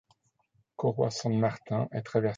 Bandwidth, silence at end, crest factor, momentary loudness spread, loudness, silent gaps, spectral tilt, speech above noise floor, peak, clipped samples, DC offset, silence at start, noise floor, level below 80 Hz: 8.8 kHz; 0 s; 18 dB; 4 LU; -30 LUFS; none; -6.5 dB/octave; 43 dB; -12 dBFS; under 0.1%; under 0.1%; 0.8 s; -72 dBFS; -68 dBFS